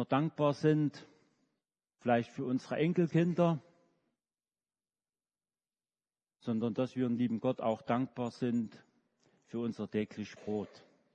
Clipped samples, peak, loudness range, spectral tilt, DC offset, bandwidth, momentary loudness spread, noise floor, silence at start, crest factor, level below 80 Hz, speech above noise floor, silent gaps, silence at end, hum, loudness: under 0.1%; -16 dBFS; 7 LU; -8 dB/octave; under 0.1%; 8.6 kHz; 10 LU; under -90 dBFS; 0 s; 20 dB; -80 dBFS; over 57 dB; none; 0.35 s; none; -34 LUFS